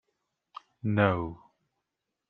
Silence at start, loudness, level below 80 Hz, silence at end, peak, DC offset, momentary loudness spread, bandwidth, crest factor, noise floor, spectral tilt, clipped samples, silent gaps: 0.85 s; -29 LUFS; -62 dBFS; 0.95 s; -8 dBFS; under 0.1%; 24 LU; 4.9 kHz; 26 dB; -85 dBFS; -9.5 dB/octave; under 0.1%; none